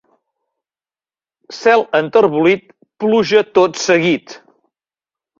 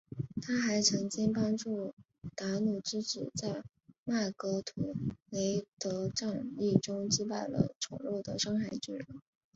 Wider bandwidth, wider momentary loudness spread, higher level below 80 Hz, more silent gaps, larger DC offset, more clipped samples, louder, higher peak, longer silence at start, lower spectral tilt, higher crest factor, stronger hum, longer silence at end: about the same, 7.6 kHz vs 8 kHz; about the same, 8 LU vs 10 LU; about the same, -60 dBFS vs -64 dBFS; second, none vs 1.93-1.97 s, 3.98-4.06 s, 5.22-5.26 s, 5.68-5.77 s, 7.76-7.81 s; neither; neither; first, -14 LUFS vs -34 LUFS; first, 0 dBFS vs -10 dBFS; first, 1.5 s vs 0.1 s; about the same, -4.5 dB/octave vs -4.5 dB/octave; second, 16 dB vs 24 dB; neither; first, 1 s vs 0.35 s